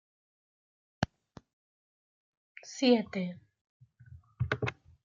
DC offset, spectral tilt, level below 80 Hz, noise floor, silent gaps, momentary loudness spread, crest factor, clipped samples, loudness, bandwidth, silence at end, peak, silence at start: under 0.1%; -5.5 dB/octave; -62 dBFS; -56 dBFS; 1.53-2.55 s, 3.61-3.80 s; 19 LU; 26 dB; under 0.1%; -32 LUFS; 7.6 kHz; 0.3 s; -10 dBFS; 1 s